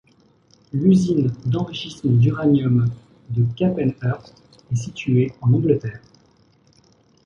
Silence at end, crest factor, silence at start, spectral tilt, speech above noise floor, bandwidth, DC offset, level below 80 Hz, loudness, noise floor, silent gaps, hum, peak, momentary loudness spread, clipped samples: 1.3 s; 16 dB; 0.75 s; -8 dB/octave; 38 dB; 7.4 kHz; under 0.1%; -52 dBFS; -20 LUFS; -57 dBFS; none; none; -4 dBFS; 11 LU; under 0.1%